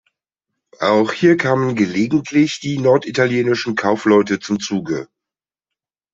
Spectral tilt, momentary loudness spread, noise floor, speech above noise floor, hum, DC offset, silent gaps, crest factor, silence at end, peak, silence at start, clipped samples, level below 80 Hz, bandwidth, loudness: -5.5 dB/octave; 7 LU; -88 dBFS; 72 dB; none; under 0.1%; none; 16 dB; 1.1 s; -2 dBFS; 0.8 s; under 0.1%; -58 dBFS; 7.8 kHz; -17 LUFS